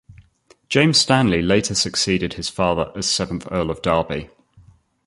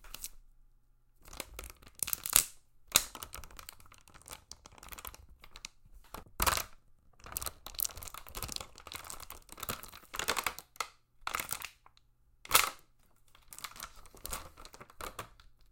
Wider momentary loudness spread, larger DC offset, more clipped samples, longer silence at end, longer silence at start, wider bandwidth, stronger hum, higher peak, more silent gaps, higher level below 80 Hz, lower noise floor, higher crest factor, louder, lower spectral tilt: second, 10 LU vs 24 LU; neither; neither; first, 0.8 s vs 0.2 s; about the same, 0.1 s vs 0 s; second, 11.5 kHz vs 17 kHz; neither; about the same, -2 dBFS vs -2 dBFS; neither; first, -42 dBFS vs -54 dBFS; second, -55 dBFS vs -66 dBFS; second, 18 dB vs 38 dB; first, -19 LUFS vs -35 LUFS; first, -4 dB/octave vs 0 dB/octave